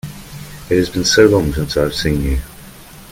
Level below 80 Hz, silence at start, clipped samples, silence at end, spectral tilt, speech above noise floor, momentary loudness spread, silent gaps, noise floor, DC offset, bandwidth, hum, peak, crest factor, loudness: -28 dBFS; 0.05 s; under 0.1%; 0.05 s; -4.5 dB/octave; 23 dB; 22 LU; none; -37 dBFS; under 0.1%; 17 kHz; none; 0 dBFS; 16 dB; -15 LUFS